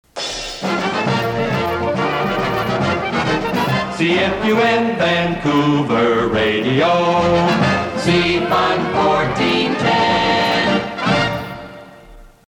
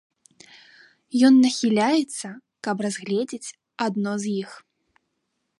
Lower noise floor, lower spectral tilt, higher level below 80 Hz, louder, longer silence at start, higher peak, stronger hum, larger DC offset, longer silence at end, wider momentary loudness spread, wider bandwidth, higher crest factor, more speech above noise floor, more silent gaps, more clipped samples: second, -41 dBFS vs -76 dBFS; about the same, -5.5 dB/octave vs -4.5 dB/octave; first, -42 dBFS vs -74 dBFS; first, -16 LUFS vs -22 LUFS; second, 0.15 s vs 1.15 s; about the same, -4 dBFS vs -6 dBFS; neither; neither; second, 0.2 s vs 1 s; second, 5 LU vs 18 LU; first, 18.5 kHz vs 11.5 kHz; about the same, 14 dB vs 18 dB; second, 26 dB vs 55 dB; neither; neither